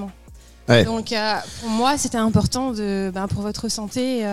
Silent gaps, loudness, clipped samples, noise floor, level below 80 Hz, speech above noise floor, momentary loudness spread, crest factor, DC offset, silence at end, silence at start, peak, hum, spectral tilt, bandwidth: none; -21 LUFS; under 0.1%; -45 dBFS; -42 dBFS; 24 dB; 9 LU; 20 dB; 0.5%; 0 s; 0 s; -2 dBFS; none; -4.5 dB/octave; 14.5 kHz